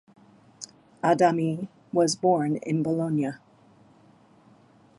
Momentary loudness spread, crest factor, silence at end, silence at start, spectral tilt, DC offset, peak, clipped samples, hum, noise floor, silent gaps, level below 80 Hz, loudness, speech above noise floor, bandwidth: 21 LU; 20 dB; 1.6 s; 0.6 s; -6 dB/octave; under 0.1%; -8 dBFS; under 0.1%; none; -57 dBFS; none; -72 dBFS; -25 LUFS; 33 dB; 11.5 kHz